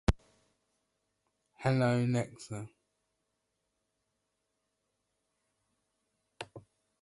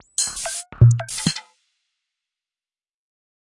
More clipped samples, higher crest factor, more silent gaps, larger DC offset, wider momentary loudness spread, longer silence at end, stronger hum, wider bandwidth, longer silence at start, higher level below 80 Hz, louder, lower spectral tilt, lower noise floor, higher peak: neither; about the same, 26 dB vs 22 dB; neither; neither; first, 19 LU vs 12 LU; second, 0.4 s vs 2.05 s; neither; about the same, 11.5 kHz vs 11.5 kHz; about the same, 0.1 s vs 0.2 s; about the same, -48 dBFS vs -44 dBFS; second, -32 LUFS vs -20 LUFS; first, -7 dB/octave vs -4 dB/octave; second, -83 dBFS vs under -90 dBFS; second, -12 dBFS vs -2 dBFS